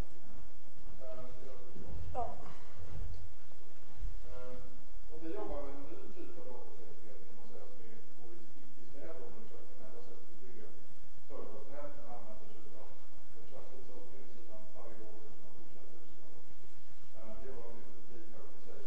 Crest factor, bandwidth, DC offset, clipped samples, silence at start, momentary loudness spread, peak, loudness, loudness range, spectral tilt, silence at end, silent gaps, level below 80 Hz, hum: 24 dB; 8.4 kHz; 6%; under 0.1%; 0 s; 15 LU; -20 dBFS; -53 LUFS; 8 LU; -7 dB/octave; 0 s; none; -56 dBFS; none